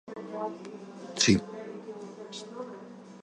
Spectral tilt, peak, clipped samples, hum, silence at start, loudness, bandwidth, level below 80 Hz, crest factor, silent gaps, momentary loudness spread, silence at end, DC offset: -3.5 dB/octave; -8 dBFS; under 0.1%; none; 0.05 s; -31 LUFS; 11.5 kHz; -60 dBFS; 24 dB; none; 20 LU; 0 s; under 0.1%